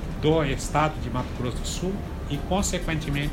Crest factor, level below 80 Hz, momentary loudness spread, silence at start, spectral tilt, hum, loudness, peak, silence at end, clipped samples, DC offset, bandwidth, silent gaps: 18 dB; -34 dBFS; 7 LU; 0 s; -5 dB/octave; none; -27 LUFS; -8 dBFS; 0 s; under 0.1%; under 0.1%; 16 kHz; none